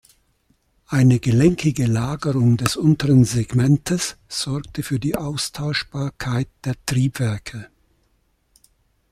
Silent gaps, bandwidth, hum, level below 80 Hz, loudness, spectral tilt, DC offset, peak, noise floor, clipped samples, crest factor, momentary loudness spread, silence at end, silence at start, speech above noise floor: none; 15 kHz; none; -46 dBFS; -20 LUFS; -6 dB/octave; under 0.1%; 0 dBFS; -64 dBFS; under 0.1%; 20 dB; 11 LU; 1.45 s; 0.9 s; 45 dB